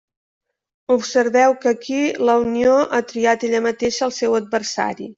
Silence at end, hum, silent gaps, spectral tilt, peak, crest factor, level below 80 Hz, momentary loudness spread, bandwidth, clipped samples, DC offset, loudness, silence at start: 0.05 s; none; none; -3.5 dB/octave; -2 dBFS; 16 dB; -56 dBFS; 6 LU; 7.8 kHz; under 0.1%; under 0.1%; -18 LUFS; 0.9 s